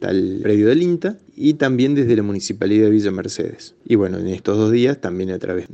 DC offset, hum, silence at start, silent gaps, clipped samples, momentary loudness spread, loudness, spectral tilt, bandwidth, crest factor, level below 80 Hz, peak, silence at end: under 0.1%; none; 0 s; none; under 0.1%; 10 LU; -18 LUFS; -6.5 dB/octave; 8.6 kHz; 14 dB; -58 dBFS; -2 dBFS; 0 s